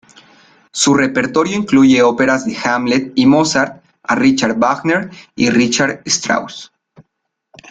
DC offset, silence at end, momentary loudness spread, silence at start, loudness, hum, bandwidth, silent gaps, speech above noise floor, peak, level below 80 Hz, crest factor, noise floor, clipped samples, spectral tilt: under 0.1%; 0.7 s; 8 LU; 0.75 s; -14 LUFS; none; 9.4 kHz; none; 59 dB; 0 dBFS; -52 dBFS; 14 dB; -73 dBFS; under 0.1%; -4 dB/octave